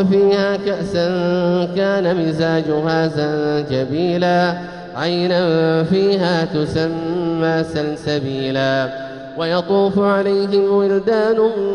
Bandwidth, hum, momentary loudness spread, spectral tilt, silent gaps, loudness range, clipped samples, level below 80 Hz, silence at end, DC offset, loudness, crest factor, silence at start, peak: 10 kHz; none; 6 LU; -7 dB/octave; none; 2 LU; under 0.1%; -50 dBFS; 0 s; under 0.1%; -17 LUFS; 14 dB; 0 s; -4 dBFS